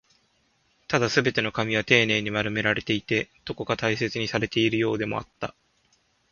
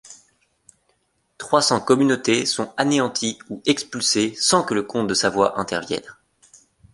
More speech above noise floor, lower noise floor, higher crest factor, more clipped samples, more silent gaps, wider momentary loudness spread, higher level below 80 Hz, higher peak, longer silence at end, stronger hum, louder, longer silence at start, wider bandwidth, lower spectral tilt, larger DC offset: second, 42 dB vs 47 dB; about the same, -67 dBFS vs -67 dBFS; first, 26 dB vs 20 dB; neither; neither; first, 12 LU vs 8 LU; about the same, -56 dBFS vs -60 dBFS; about the same, -2 dBFS vs -2 dBFS; about the same, 0.8 s vs 0.8 s; neither; second, -24 LUFS vs -20 LUFS; first, 0.9 s vs 0.1 s; second, 7.2 kHz vs 11.5 kHz; first, -4.5 dB/octave vs -3 dB/octave; neither